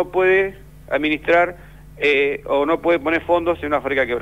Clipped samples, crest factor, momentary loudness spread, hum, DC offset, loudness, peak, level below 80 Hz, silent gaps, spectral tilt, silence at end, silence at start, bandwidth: under 0.1%; 14 dB; 5 LU; none; 0.2%; -19 LUFS; -4 dBFS; -44 dBFS; none; -6 dB/octave; 0 s; 0 s; 15 kHz